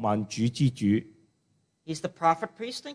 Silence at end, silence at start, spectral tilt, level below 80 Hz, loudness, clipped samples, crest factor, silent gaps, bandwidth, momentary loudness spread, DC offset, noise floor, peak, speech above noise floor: 0 s; 0 s; -6 dB/octave; -64 dBFS; -28 LUFS; under 0.1%; 18 dB; none; 11 kHz; 9 LU; under 0.1%; -72 dBFS; -10 dBFS; 44 dB